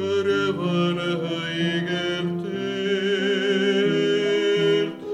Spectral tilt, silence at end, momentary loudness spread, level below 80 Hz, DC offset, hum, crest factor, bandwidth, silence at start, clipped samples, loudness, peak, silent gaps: -6 dB/octave; 0 s; 6 LU; -72 dBFS; under 0.1%; none; 12 dB; 9 kHz; 0 s; under 0.1%; -23 LUFS; -10 dBFS; none